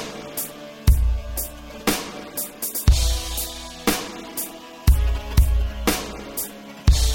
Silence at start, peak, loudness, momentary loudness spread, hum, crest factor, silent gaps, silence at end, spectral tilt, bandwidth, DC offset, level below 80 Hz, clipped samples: 0 s; -4 dBFS; -24 LUFS; 10 LU; none; 18 dB; none; 0 s; -4 dB/octave; 17 kHz; under 0.1%; -24 dBFS; under 0.1%